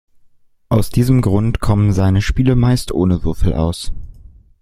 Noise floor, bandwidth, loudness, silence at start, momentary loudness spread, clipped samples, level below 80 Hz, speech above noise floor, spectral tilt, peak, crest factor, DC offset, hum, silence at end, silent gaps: -49 dBFS; 15.5 kHz; -16 LUFS; 0.7 s; 6 LU; under 0.1%; -26 dBFS; 36 dB; -7.5 dB/octave; 0 dBFS; 14 dB; under 0.1%; none; 0.5 s; none